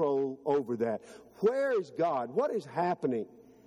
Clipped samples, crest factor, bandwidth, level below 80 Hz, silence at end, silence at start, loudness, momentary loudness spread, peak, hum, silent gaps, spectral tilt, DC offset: under 0.1%; 16 dB; 11 kHz; -78 dBFS; 0.4 s; 0 s; -32 LUFS; 5 LU; -16 dBFS; none; none; -7 dB/octave; under 0.1%